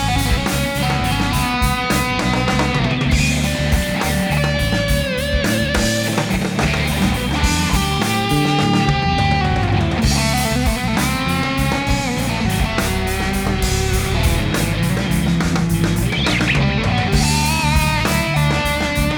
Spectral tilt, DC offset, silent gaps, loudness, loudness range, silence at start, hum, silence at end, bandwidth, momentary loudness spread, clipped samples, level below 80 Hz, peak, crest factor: -4.5 dB/octave; under 0.1%; none; -17 LUFS; 2 LU; 0 s; none; 0 s; over 20 kHz; 3 LU; under 0.1%; -24 dBFS; -4 dBFS; 14 dB